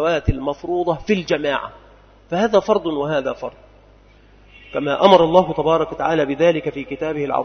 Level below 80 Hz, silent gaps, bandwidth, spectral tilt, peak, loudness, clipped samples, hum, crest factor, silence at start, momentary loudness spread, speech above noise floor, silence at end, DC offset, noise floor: -38 dBFS; none; 6.6 kHz; -6.5 dB/octave; 0 dBFS; -19 LUFS; under 0.1%; none; 20 dB; 0 s; 13 LU; 31 dB; 0 s; under 0.1%; -49 dBFS